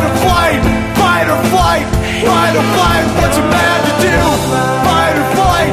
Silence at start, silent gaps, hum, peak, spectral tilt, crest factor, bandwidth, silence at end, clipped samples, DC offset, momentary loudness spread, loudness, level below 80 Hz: 0 s; none; none; 0 dBFS; -4.5 dB/octave; 12 dB; 15.5 kHz; 0 s; under 0.1%; under 0.1%; 3 LU; -11 LUFS; -24 dBFS